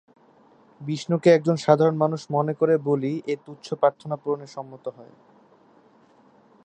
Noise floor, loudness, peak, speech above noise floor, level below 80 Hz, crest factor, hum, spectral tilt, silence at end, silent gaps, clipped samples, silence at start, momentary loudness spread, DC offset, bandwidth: -56 dBFS; -23 LUFS; -2 dBFS; 34 dB; -74 dBFS; 22 dB; none; -7 dB/octave; 1.6 s; none; under 0.1%; 0.8 s; 18 LU; under 0.1%; 9 kHz